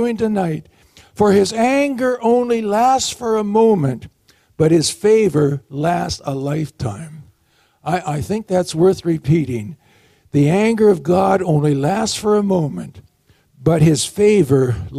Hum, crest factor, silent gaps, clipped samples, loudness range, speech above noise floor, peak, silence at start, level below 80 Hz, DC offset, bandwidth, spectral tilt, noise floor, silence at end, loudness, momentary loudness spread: none; 14 dB; none; under 0.1%; 4 LU; 43 dB; -2 dBFS; 0 s; -46 dBFS; under 0.1%; 15 kHz; -6 dB/octave; -59 dBFS; 0 s; -16 LUFS; 11 LU